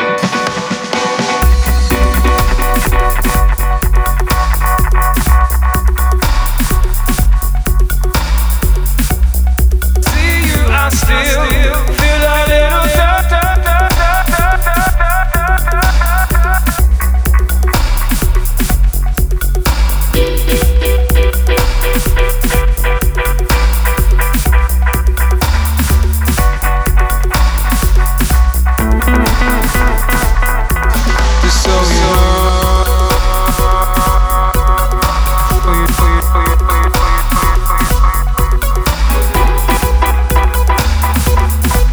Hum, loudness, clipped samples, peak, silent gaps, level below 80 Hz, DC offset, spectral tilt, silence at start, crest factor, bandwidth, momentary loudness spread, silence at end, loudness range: none; -12 LUFS; under 0.1%; 0 dBFS; none; -10 dBFS; under 0.1%; -4.5 dB/octave; 0 s; 10 dB; over 20 kHz; 3 LU; 0 s; 2 LU